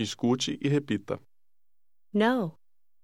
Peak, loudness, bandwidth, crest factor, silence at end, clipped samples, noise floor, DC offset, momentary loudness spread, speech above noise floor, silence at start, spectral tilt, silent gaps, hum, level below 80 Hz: -12 dBFS; -29 LUFS; 13 kHz; 18 dB; 0.55 s; under 0.1%; -89 dBFS; 0.1%; 12 LU; 62 dB; 0 s; -5.5 dB/octave; none; none; -70 dBFS